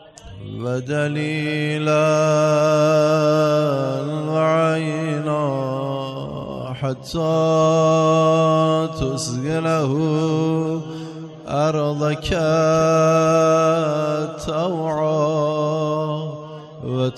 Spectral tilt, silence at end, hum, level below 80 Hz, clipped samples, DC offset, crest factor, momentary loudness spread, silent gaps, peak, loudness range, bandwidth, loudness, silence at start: -6.5 dB/octave; 0 s; none; -46 dBFS; under 0.1%; under 0.1%; 14 dB; 12 LU; none; -6 dBFS; 4 LU; 12 kHz; -19 LUFS; 0.25 s